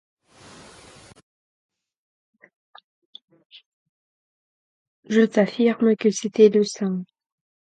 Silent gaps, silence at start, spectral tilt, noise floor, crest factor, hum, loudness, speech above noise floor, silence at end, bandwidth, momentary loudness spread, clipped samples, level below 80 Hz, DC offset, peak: none; 5.1 s; -5.5 dB/octave; -48 dBFS; 22 dB; none; -20 LUFS; 29 dB; 0.6 s; 10.5 kHz; 11 LU; under 0.1%; -70 dBFS; under 0.1%; -4 dBFS